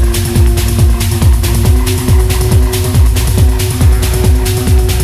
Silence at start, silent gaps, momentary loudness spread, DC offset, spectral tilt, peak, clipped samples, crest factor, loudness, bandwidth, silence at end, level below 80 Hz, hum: 0 s; none; 1 LU; under 0.1%; -5.5 dB/octave; 0 dBFS; under 0.1%; 8 dB; -11 LUFS; 15.5 kHz; 0 s; -12 dBFS; none